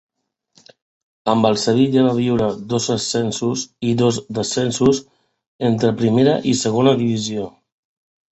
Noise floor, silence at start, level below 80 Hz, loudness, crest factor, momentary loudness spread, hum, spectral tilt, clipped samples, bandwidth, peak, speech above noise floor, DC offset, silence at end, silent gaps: -60 dBFS; 1.25 s; -52 dBFS; -18 LUFS; 16 dB; 7 LU; none; -5.5 dB/octave; under 0.1%; 8.2 kHz; -2 dBFS; 43 dB; under 0.1%; 0.8 s; 5.47-5.59 s